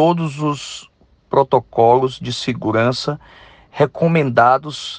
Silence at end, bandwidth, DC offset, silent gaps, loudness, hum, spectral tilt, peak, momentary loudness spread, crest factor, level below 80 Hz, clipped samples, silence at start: 0 s; 9.6 kHz; under 0.1%; none; -17 LUFS; none; -6 dB/octave; 0 dBFS; 13 LU; 16 dB; -54 dBFS; under 0.1%; 0 s